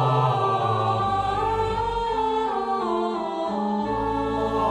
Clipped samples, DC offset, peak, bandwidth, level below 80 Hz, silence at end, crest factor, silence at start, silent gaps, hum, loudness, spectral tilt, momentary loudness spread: under 0.1%; under 0.1%; -10 dBFS; 11 kHz; -42 dBFS; 0 s; 14 dB; 0 s; none; none; -24 LUFS; -7 dB/octave; 4 LU